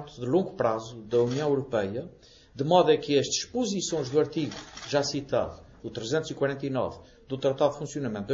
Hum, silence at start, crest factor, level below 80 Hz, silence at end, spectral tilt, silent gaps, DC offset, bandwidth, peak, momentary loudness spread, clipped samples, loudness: none; 0 s; 20 dB; -58 dBFS; 0 s; -5 dB/octave; none; under 0.1%; 8 kHz; -8 dBFS; 12 LU; under 0.1%; -28 LUFS